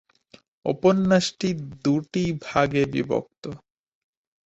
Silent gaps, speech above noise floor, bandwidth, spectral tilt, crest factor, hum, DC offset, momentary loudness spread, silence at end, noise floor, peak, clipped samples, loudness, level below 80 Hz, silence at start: 3.38-3.42 s; 33 dB; 8.2 kHz; -6 dB/octave; 20 dB; none; under 0.1%; 17 LU; 0.95 s; -56 dBFS; -4 dBFS; under 0.1%; -23 LUFS; -56 dBFS; 0.65 s